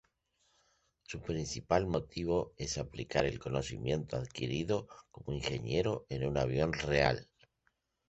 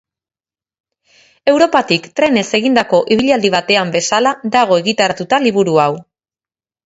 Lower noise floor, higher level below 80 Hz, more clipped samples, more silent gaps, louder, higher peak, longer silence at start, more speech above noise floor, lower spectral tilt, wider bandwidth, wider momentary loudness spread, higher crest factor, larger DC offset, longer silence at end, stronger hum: second, -79 dBFS vs under -90 dBFS; about the same, -52 dBFS vs -56 dBFS; neither; neither; second, -35 LUFS vs -13 LUFS; second, -12 dBFS vs 0 dBFS; second, 1.1 s vs 1.45 s; second, 44 dB vs over 77 dB; first, -5.5 dB/octave vs -4 dB/octave; about the same, 8.2 kHz vs 8 kHz; first, 8 LU vs 3 LU; first, 24 dB vs 14 dB; neither; about the same, 0.85 s vs 0.85 s; neither